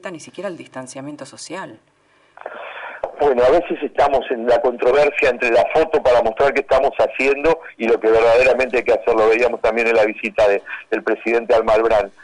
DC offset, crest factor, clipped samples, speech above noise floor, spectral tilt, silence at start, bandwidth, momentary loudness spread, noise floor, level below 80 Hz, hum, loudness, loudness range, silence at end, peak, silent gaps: under 0.1%; 10 dB; under 0.1%; 29 dB; -4.5 dB/octave; 0.05 s; 11 kHz; 17 LU; -46 dBFS; -44 dBFS; 50 Hz at -65 dBFS; -16 LUFS; 6 LU; 0.15 s; -8 dBFS; none